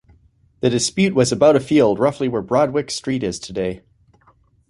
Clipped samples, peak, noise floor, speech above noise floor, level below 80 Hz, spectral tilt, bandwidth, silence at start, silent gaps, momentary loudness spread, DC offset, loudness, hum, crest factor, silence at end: under 0.1%; -2 dBFS; -56 dBFS; 39 dB; -50 dBFS; -5 dB/octave; 11.5 kHz; 0.65 s; none; 11 LU; under 0.1%; -18 LUFS; none; 18 dB; 0.9 s